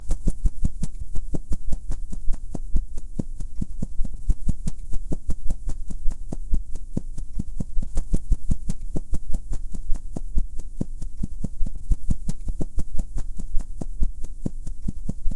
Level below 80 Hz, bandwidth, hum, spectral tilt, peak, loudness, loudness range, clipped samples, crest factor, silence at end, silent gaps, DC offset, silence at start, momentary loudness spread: -26 dBFS; 10 kHz; none; -7.5 dB/octave; -4 dBFS; -33 LUFS; 2 LU; under 0.1%; 14 dB; 0 s; none; under 0.1%; 0 s; 6 LU